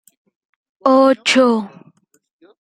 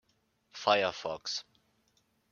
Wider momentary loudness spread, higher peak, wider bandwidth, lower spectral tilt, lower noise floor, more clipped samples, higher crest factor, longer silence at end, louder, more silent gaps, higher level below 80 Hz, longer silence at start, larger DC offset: about the same, 9 LU vs 11 LU; first, 0 dBFS vs -10 dBFS; first, 11.5 kHz vs 7.2 kHz; about the same, -3.5 dB/octave vs -2.5 dB/octave; second, -54 dBFS vs -74 dBFS; neither; second, 18 dB vs 26 dB; about the same, 0.95 s vs 0.9 s; first, -14 LUFS vs -32 LUFS; neither; first, -68 dBFS vs -76 dBFS; first, 0.85 s vs 0.55 s; neither